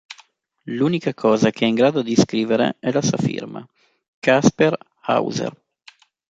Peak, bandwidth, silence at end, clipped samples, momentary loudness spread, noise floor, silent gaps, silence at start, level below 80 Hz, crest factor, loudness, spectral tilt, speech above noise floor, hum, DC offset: -2 dBFS; 9 kHz; 0.8 s; under 0.1%; 14 LU; -54 dBFS; 4.08-4.22 s; 0.1 s; -58 dBFS; 18 dB; -19 LUFS; -5.5 dB/octave; 35 dB; none; under 0.1%